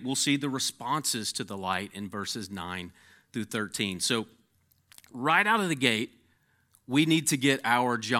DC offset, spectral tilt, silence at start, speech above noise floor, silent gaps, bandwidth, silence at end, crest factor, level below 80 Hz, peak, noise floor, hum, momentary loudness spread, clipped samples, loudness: under 0.1%; -3 dB/octave; 0 s; 40 dB; none; 17 kHz; 0 s; 22 dB; -76 dBFS; -8 dBFS; -68 dBFS; none; 14 LU; under 0.1%; -28 LUFS